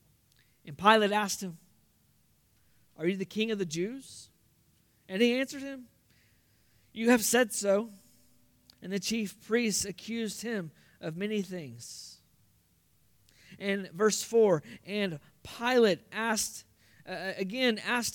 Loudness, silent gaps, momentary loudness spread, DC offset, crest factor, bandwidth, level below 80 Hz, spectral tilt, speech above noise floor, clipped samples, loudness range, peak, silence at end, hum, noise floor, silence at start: -30 LUFS; none; 19 LU; under 0.1%; 24 dB; 18 kHz; -70 dBFS; -3.5 dB/octave; 38 dB; under 0.1%; 8 LU; -8 dBFS; 0 s; none; -68 dBFS; 0.65 s